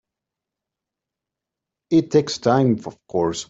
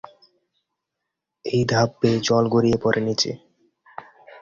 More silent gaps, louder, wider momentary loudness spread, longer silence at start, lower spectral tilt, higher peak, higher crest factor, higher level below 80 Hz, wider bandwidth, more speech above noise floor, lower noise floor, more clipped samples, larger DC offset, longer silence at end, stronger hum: neither; about the same, -20 LUFS vs -21 LUFS; second, 7 LU vs 23 LU; first, 1.9 s vs 1.45 s; about the same, -6 dB/octave vs -5.5 dB/octave; about the same, -4 dBFS vs -4 dBFS; about the same, 20 dB vs 18 dB; second, -60 dBFS vs -54 dBFS; about the same, 8 kHz vs 7.4 kHz; first, 67 dB vs 62 dB; first, -86 dBFS vs -82 dBFS; neither; neither; about the same, 0.05 s vs 0.05 s; neither